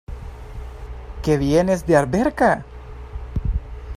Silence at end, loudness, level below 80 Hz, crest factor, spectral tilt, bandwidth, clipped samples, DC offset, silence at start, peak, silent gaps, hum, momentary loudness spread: 0 s; -20 LUFS; -32 dBFS; 20 dB; -7 dB/octave; 15.5 kHz; under 0.1%; under 0.1%; 0.1 s; -2 dBFS; none; none; 20 LU